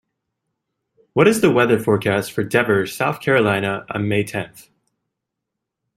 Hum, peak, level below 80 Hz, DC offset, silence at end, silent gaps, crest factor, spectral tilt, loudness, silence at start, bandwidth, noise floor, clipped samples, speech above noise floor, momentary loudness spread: none; -2 dBFS; -56 dBFS; under 0.1%; 1.35 s; none; 18 dB; -5.5 dB/octave; -18 LUFS; 1.15 s; 16 kHz; -81 dBFS; under 0.1%; 63 dB; 9 LU